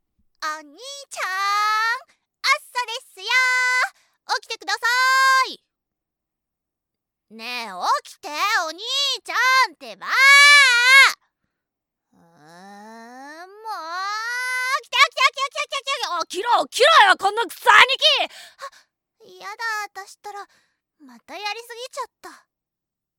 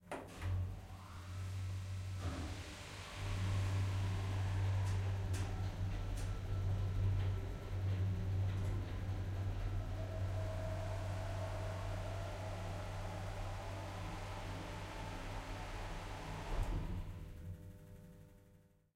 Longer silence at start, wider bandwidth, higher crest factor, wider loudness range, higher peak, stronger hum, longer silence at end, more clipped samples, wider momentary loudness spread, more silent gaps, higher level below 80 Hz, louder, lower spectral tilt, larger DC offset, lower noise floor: first, 0.4 s vs 0 s; first, 19 kHz vs 12.5 kHz; first, 22 dB vs 14 dB; first, 18 LU vs 6 LU; first, 0 dBFS vs -26 dBFS; neither; first, 0.9 s vs 0.4 s; neither; first, 23 LU vs 11 LU; neither; second, -78 dBFS vs -48 dBFS; first, -17 LUFS vs -43 LUFS; second, 2 dB/octave vs -6 dB/octave; neither; first, -86 dBFS vs -67 dBFS